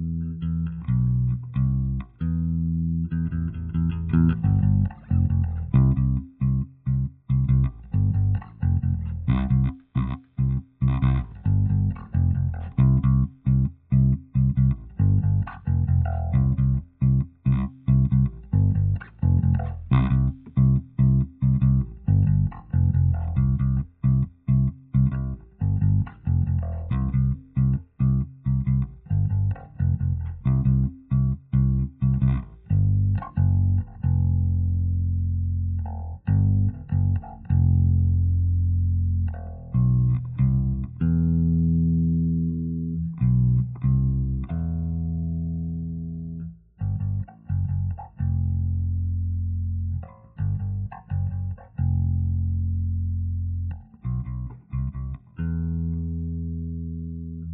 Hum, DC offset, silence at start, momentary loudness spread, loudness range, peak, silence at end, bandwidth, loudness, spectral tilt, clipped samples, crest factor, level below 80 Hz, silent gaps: 60 Hz at -55 dBFS; under 0.1%; 0 s; 9 LU; 6 LU; -6 dBFS; 0 s; 3.8 kHz; -24 LUFS; -11.5 dB/octave; under 0.1%; 16 dB; -34 dBFS; none